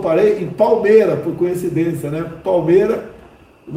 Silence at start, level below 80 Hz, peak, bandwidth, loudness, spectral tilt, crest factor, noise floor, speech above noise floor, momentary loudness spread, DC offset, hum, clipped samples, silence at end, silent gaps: 0 s; -50 dBFS; 0 dBFS; 16 kHz; -16 LUFS; -7.5 dB/octave; 16 dB; -44 dBFS; 29 dB; 11 LU; under 0.1%; none; under 0.1%; 0 s; none